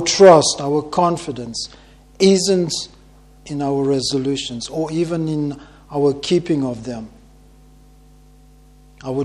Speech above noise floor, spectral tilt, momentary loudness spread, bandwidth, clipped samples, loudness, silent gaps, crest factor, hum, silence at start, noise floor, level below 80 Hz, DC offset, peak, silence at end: 30 dB; -4.5 dB/octave; 17 LU; 12 kHz; under 0.1%; -18 LUFS; none; 18 dB; none; 0 s; -47 dBFS; -48 dBFS; under 0.1%; 0 dBFS; 0 s